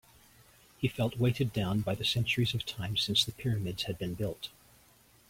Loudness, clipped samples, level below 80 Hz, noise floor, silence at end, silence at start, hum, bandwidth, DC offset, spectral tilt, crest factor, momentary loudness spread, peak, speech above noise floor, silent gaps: -31 LUFS; under 0.1%; -58 dBFS; -62 dBFS; 0.8 s; 0.8 s; none; 16.5 kHz; under 0.1%; -5 dB/octave; 20 dB; 8 LU; -14 dBFS; 31 dB; none